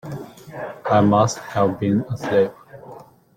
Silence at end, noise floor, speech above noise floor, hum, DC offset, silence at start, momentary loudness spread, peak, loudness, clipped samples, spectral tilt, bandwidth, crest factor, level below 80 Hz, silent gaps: 0.35 s; -43 dBFS; 24 dB; none; under 0.1%; 0.05 s; 20 LU; -4 dBFS; -20 LUFS; under 0.1%; -6.5 dB/octave; 15.5 kHz; 18 dB; -56 dBFS; none